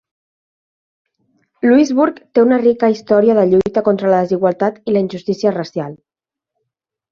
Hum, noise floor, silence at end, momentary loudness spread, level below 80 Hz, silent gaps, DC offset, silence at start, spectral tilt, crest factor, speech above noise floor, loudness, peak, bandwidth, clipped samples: none; -78 dBFS; 1.15 s; 8 LU; -56 dBFS; none; under 0.1%; 1.65 s; -7 dB/octave; 14 dB; 65 dB; -14 LUFS; -2 dBFS; 7.2 kHz; under 0.1%